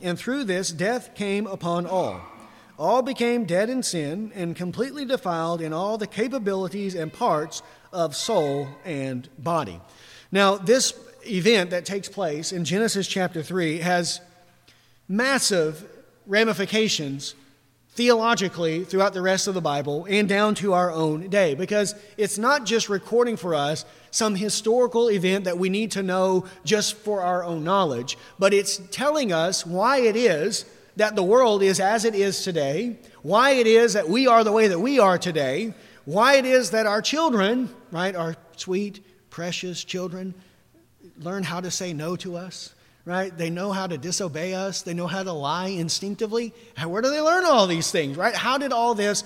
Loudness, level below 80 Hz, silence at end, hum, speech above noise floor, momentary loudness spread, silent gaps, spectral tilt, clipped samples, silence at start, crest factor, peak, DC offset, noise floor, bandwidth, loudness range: -23 LUFS; -68 dBFS; 0 s; none; 35 dB; 12 LU; none; -4 dB/octave; under 0.1%; 0 s; 18 dB; -4 dBFS; under 0.1%; -58 dBFS; 16.5 kHz; 9 LU